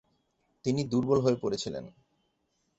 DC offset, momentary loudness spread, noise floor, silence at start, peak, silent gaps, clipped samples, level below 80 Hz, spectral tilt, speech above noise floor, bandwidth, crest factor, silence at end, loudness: under 0.1%; 11 LU; -76 dBFS; 0.65 s; -12 dBFS; none; under 0.1%; -64 dBFS; -6.5 dB/octave; 48 dB; 8.2 kHz; 20 dB; 0.9 s; -29 LUFS